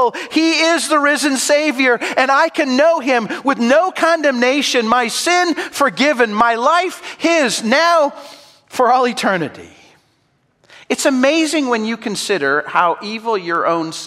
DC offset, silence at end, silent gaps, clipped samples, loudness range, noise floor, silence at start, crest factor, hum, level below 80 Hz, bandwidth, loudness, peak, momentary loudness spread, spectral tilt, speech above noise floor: under 0.1%; 0 s; none; under 0.1%; 4 LU; -61 dBFS; 0 s; 16 dB; none; -64 dBFS; 16 kHz; -15 LUFS; 0 dBFS; 7 LU; -2.5 dB/octave; 46 dB